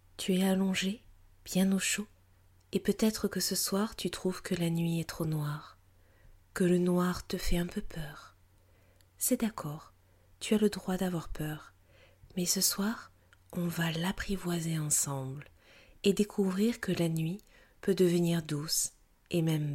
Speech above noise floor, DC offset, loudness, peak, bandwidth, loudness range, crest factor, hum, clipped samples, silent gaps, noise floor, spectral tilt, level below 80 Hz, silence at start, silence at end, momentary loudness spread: 32 dB; under 0.1%; -32 LUFS; -14 dBFS; 16.5 kHz; 3 LU; 18 dB; none; under 0.1%; none; -63 dBFS; -4.5 dB/octave; -50 dBFS; 0.2 s; 0 s; 14 LU